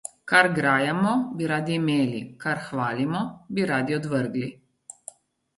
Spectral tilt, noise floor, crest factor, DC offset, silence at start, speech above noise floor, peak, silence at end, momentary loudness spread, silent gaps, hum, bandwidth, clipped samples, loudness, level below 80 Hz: -5.5 dB/octave; -48 dBFS; 22 dB; under 0.1%; 0.05 s; 24 dB; -4 dBFS; 1.05 s; 13 LU; none; none; 11.5 kHz; under 0.1%; -24 LUFS; -66 dBFS